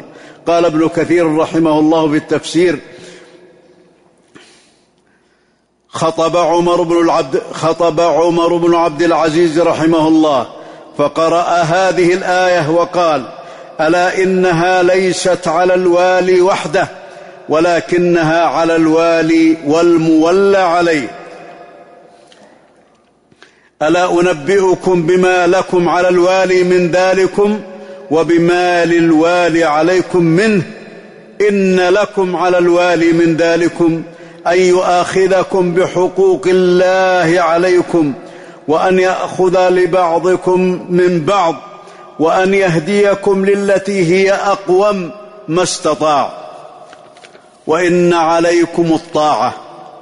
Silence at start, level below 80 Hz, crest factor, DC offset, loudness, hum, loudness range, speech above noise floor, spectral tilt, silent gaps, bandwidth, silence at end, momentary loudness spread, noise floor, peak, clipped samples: 0.05 s; -50 dBFS; 10 dB; under 0.1%; -12 LUFS; none; 5 LU; 46 dB; -5.5 dB/octave; none; 11 kHz; 0 s; 7 LU; -57 dBFS; -2 dBFS; under 0.1%